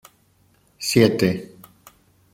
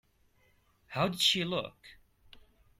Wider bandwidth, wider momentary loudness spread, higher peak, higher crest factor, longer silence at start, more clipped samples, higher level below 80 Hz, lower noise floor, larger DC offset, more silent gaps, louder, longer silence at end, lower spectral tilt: about the same, 16.5 kHz vs 16 kHz; about the same, 15 LU vs 15 LU; first, -2 dBFS vs -14 dBFS; about the same, 22 dB vs 22 dB; about the same, 0.8 s vs 0.9 s; neither; first, -58 dBFS vs -66 dBFS; second, -60 dBFS vs -69 dBFS; neither; neither; first, -20 LUFS vs -30 LUFS; first, 0.9 s vs 0.4 s; first, -5 dB/octave vs -3.5 dB/octave